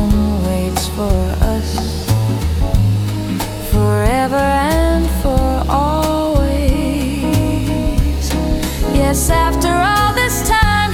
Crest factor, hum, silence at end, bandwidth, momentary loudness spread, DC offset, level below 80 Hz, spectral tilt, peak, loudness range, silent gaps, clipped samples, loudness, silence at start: 14 dB; none; 0 s; 17.5 kHz; 5 LU; under 0.1%; -20 dBFS; -5.5 dB/octave; -2 dBFS; 2 LU; none; under 0.1%; -16 LUFS; 0 s